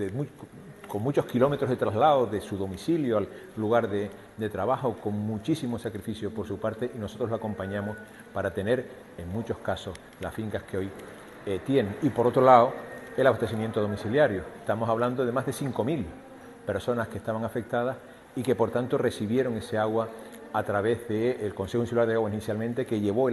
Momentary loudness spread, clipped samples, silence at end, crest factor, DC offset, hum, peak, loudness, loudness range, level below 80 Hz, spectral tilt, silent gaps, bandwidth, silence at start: 13 LU; under 0.1%; 0 s; 24 dB; under 0.1%; none; -4 dBFS; -28 LUFS; 8 LU; -58 dBFS; -7 dB/octave; none; 13 kHz; 0 s